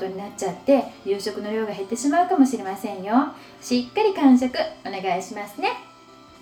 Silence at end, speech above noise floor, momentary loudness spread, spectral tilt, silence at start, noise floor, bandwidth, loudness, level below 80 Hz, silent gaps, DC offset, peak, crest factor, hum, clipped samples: 0.55 s; 25 dB; 12 LU; -4.5 dB/octave; 0 s; -48 dBFS; 15 kHz; -23 LUFS; -64 dBFS; none; under 0.1%; -4 dBFS; 18 dB; none; under 0.1%